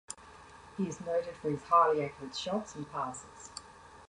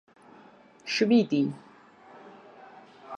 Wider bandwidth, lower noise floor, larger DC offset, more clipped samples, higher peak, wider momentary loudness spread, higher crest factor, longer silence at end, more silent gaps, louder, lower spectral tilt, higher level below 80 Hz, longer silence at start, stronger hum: first, 11 kHz vs 7.8 kHz; about the same, -54 dBFS vs -54 dBFS; neither; neither; second, -14 dBFS vs -10 dBFS; second, 22 LU vs 27 LU; about the same, 20 dB vs 20 dB; about the same, 0.05 s vs 0 s; neither; second, -32 LUFS vs -25 LUFS; about the same, -5 dB/octave vs -5.5 dB/octave; first, -66 dBFS vs -78 dBFS; second, 0.1 s vs 0.85 s; neither